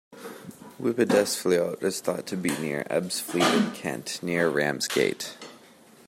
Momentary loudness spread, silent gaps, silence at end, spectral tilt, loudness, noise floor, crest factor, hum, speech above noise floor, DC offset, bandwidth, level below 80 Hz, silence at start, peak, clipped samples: 19 LU; none; 0.5 s; -4 dB/octave; -26 LUFS; -53 dBFS; 20 dB; none; 27 dB; under 0.1%; 16 kHz; -72 dBFS; 0.1 s; -8 dBFS; under 0.1%